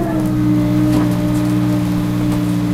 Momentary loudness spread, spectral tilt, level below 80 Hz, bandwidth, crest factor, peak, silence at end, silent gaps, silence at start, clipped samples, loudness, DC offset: 3 LU; -7.5 dB/octave; -32 dBFS; 15.5 kHz; 14 dB; -2 dBFS; 0 s; none; 0 s; under 0.1%; -16 LUFS; under 0.1%